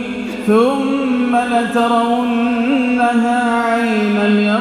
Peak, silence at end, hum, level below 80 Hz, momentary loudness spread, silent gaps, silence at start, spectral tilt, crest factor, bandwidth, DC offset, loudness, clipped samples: -2 dBFS; 0 s; none; -52 dBFS; 3 LU; none; 0 s; -6 dB/octave; 14 dB; 12.5 kHz; under 0.1%; -15 LUFS; under 0.1%